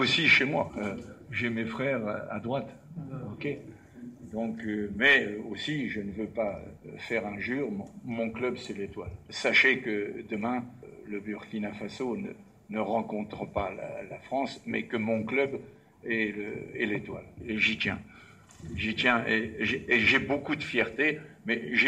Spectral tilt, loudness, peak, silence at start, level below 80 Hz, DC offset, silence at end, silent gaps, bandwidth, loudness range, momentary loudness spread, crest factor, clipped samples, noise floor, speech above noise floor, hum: -5 dB/octave; -29 LUFS; -12 dBFS; 0 s; -58 dBFS; under 0.1%; 0 s; none; 11.5 kHz; 8 LU; 19 LU; 20 dB; under 0.1%; -53 dBFS; 22 dB; none